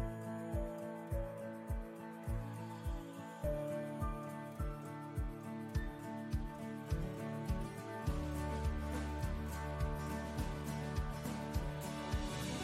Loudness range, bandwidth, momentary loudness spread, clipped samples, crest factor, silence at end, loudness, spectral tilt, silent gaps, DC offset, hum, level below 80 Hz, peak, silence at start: 3 LU; 16 kHz; 5 LU; under 0.1%; 16 dB; 0 s; -43 LUFS; -6.5 dB/octave; none; under 0.1%; none; -46 dBFS; -26 dBFS; 0 s